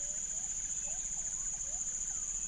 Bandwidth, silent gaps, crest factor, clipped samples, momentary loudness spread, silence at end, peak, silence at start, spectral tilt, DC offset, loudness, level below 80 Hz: 10.5 kHz; none; 14 dB; under 0.1%; 0 LU; 0 s; -24 dBFS; 0 s; 0 dB/octave; under 0.1%; -35 LUFS; -54 dBFS